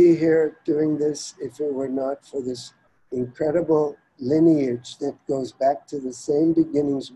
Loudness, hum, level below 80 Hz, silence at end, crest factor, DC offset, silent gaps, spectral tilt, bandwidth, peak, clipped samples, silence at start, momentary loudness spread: -23 LUFS; none; -62 dBFS; 0 s; 16 dB; under 0.1%; none; -6.5 dB/octave; 10.5 kHz; -6 dBFS; under 0.1%; 0 s; 13 LU